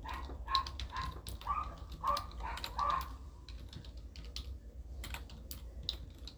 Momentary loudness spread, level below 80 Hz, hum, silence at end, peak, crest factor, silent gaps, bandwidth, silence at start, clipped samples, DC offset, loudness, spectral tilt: 15 LU; -48 dBFS; none; 0 s; -14 dBFS; 28 dB; none; over 20 kHz; 0 s; under 0.1%; under 0.1%; -41 LUFS; -3.5 dB/octave